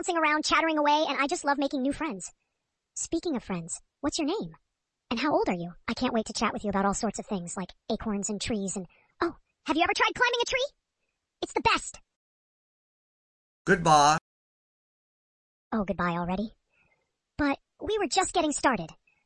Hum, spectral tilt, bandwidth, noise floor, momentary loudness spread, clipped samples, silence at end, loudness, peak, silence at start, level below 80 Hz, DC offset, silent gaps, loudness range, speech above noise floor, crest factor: none; -3.5 dB/octave; 11.5 kHz; -83 dBFS; 13 LU; under 0.1%; 0.35 s; -28 LUFS; -6 dBFS; 0 s; -54 dBFS; under 0.1%; 12.16-13.65 s, 14.21-15.71 s; 6 LU; 55 dB; 22 dB